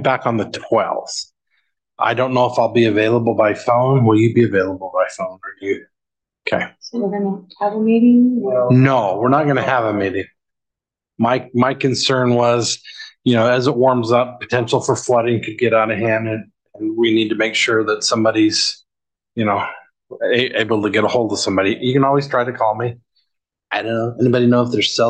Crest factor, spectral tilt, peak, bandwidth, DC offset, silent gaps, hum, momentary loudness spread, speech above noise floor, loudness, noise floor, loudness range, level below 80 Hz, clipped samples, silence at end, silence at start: 16 dB; -5.5 dB/octave; -2 dBFS; 9.4 kHz; under 0.1%; none; none; 11 LU; 69 dB; -17 LUFS; -85 dBFS; 3 LU; -56 dBFS; under 0.1%; 0 s; 0 s